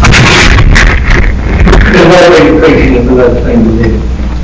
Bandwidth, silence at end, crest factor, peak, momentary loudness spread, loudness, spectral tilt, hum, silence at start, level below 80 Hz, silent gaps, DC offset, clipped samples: 8 kHz; 0 s; 4 dB; 0 dBFS; 7 LU; -5 LUFS; -5.5 dB/octave; none; 0 s; -8 dBFS; none; under 0.1%; 10%